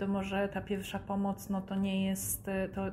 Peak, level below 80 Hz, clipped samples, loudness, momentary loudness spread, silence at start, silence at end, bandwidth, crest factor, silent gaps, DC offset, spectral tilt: -22 dBFS; -54 dBFS; under 0.1%; -35 LUFS; 5 LU; 0 s; 0 s; 15.5 kHz; 12 dB; none; under 0.1%; -5 dB/octave